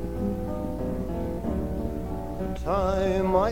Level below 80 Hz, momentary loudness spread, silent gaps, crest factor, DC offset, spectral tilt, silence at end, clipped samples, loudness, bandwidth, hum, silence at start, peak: -36 dBFS; 8 LU; none; 18 dB; 0.9%; -8 dB/octave; 0 s; under 0.1%; -29 LUFS; 17 kHz; none; 0 s; -8 dBFS